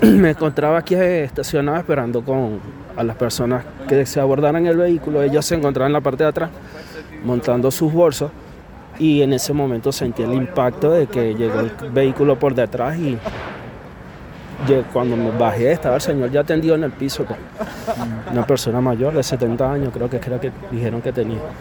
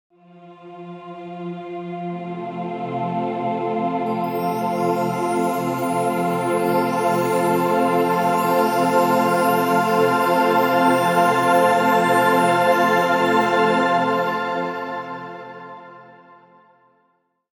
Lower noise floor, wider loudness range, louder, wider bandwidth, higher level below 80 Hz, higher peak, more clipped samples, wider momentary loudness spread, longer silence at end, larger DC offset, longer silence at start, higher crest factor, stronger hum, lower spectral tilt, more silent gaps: second, -38 dBFS vs -66 dBFS; second, 3 LU vs 10 LU; about the same, -19 LUFS vs -19 LUFS; about the same, 19 kHz vs 18 kHz; first, -42 dBFS vs -64 dBFS; first, 0 dBFS vs -4 dBFS; neither; second, 12 LU vs 15 LU; second, 0 s vs 1.5 s; neither; second, 0 s vs 0.35 s; about the same, 18 dB vs 16 dB; neither; about the same, -6.5 dB/octave vs -5.5 dB/octave; neither